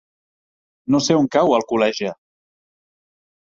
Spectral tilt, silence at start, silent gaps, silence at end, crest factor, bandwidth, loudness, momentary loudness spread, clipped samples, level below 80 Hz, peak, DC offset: -5 dB/octave; 0.9 s; none; 1.45 s; 20 dB; 7.8 kHz; -18 LUFS; 11 LU; under 0.1%; -62 dBFS; -2 dBFS; under 0.1%